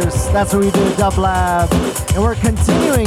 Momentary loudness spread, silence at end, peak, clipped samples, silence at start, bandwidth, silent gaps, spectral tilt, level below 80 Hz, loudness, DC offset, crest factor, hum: 2 LU; 0 s; -2 dBFS; under 0.1%; 0 s; 16 kHz; none; -5.5 dB/octave; -24 dBFS; -15 LUFS; under 0.1%; 12 dB; none